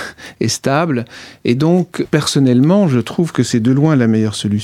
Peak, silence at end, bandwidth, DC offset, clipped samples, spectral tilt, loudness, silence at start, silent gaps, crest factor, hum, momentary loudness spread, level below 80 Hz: 0 dBFS; 0 s; 15 kHz; under 0.1%; under 0.1%; -6 dB/octave; -14 LUFS; 0 s; none; 14 dB; none; 9 LU; -52 dBFS